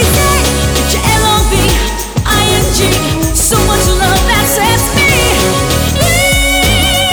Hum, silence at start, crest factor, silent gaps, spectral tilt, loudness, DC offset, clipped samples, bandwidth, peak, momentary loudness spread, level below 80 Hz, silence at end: none; 0 s; 8 dB; none; -3.5 dB/octave; -10 LUFS; under 0.1%; under 0.1%; over 20 kHz; -2 dBFS; 3 LU; -16 dBFS; 0 s